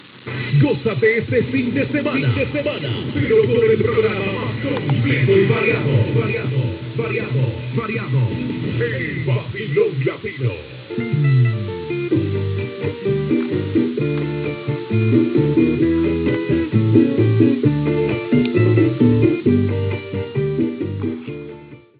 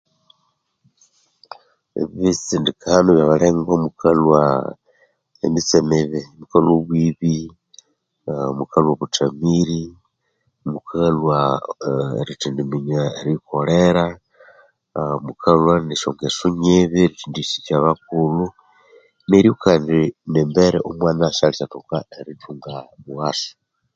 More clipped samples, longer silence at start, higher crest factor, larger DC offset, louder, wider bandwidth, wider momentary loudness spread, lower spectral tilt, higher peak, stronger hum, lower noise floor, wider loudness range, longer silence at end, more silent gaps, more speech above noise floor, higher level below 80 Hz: neither; second, 0.05 s vs 1.95 s; about the same, 18 dB vs 18 dB; neither; about the same, -19 LUFS vs -18 LUFS; second, 4.8 kHz vs 7.8 kHz; second, 9 LU vs 14 LU; first, -12 dB/octave vs -6 dB/octave; about the same, 0 dBFS vs 0 dBFS; neither; second, -38 dBFS vs -69 dBFS; about the same, 5 LU vs 5 LU; second, 0.2 s vs 0.45 s; neither; second, 20 dB vs 51 dB; about the same, -44 dBFS vs -48 dBFS